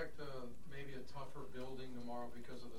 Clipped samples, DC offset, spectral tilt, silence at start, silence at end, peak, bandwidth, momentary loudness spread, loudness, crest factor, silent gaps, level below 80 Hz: under 0.1%; 0.8%; -6 dB/octave; 0 s; 0 s; -32 dBFS; 16 kHz; 5 LU; -51 LUFS; 18 dB; none; -64 dBFS